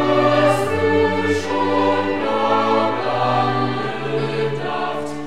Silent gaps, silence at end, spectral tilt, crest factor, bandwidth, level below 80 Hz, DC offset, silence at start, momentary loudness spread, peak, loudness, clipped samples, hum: none; 0 s; -6 dB/octave; 16 dB; 14.5 kHz; -56 dBFS; 2%; 0 s; 7 LU; -4 dBFS; -19 LUFS; under 0.1%; none